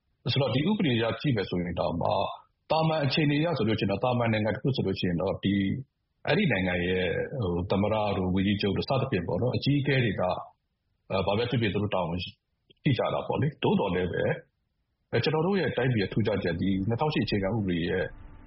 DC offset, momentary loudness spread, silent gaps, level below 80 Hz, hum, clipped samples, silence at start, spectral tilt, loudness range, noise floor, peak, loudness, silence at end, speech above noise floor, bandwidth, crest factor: under 0.1%; 5 LU; none; -52 dBFS; none; under 0.1%; 0.25 s; -5 dB/octave; 2 LU; -77 dBFS; -12 dBFS; -28 LUFS; 0 s; 50 dB; 5.8 kHz; 16 dB